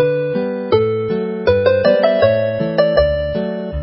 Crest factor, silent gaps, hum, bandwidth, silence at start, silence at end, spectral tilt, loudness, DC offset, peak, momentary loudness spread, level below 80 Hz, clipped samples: 16 dB; none; none; 5.8 kHz; 0 s; 0 s; -11 dB/octave; -16 LUFS; under 0.1%; 0 dBFS; 7 LU; -34 dBFS; under 0.1%